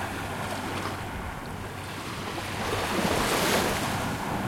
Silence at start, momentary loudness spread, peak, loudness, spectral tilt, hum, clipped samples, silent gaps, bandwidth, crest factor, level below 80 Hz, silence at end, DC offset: 0 s; 12 LU; -12 dBFS; -29 LUFS; -4 dB/octave; none; under 0.1%; none; 16.5 kHz; 18 dB; -46 dBFS; 0 s; under 0.1%